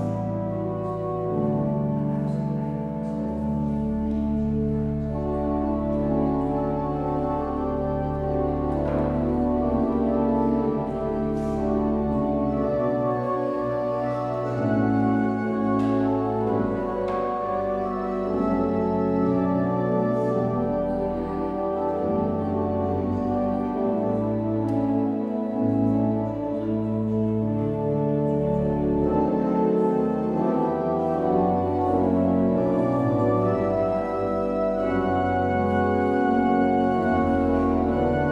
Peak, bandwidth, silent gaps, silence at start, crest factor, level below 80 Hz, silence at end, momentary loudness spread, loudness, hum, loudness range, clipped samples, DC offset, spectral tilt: -8 dBFS; 6.4 kHz; none; 0 s; 14 dB; -40 dBFS; 0 s; 5 LU; -24 LUFS; none; 3 LU; under 0.1%; under 0.1%; -10 dB/octave